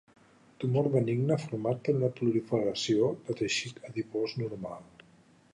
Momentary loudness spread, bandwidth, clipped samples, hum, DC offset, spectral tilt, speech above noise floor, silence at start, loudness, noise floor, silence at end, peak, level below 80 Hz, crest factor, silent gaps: 10 LU; 10.5 kHz; under 0.1%; none; under 0.1%; -6 dB/octave; 31 dB; 0.6 s; -31 LUFS; -61 dBFS; 0.7 s; -12 dBFS; -70 dBFS; 18 dB; none